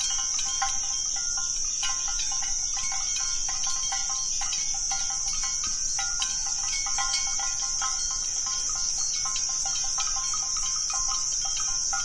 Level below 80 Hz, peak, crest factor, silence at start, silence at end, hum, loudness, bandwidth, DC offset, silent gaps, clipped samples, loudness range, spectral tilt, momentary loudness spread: -44 dBFS; -12 dBFS; 16 dB; 0 s; 0 s; none; -25 LUFS; 11.5 kHz; under 0.1%; none; under 0.1%; 1 LU; 2.5 dB/octave; 1 LU